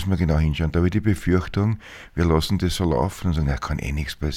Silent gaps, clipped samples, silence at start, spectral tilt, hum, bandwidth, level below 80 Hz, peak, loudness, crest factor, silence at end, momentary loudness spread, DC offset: none; under 0.1%; 0 s; -6.5 dB/octave; none; 15.5 kHz; -30 dBFS; -4 dBFS; -23 LUFS; 18 dB; 0 s; 6 LU; under 0.1%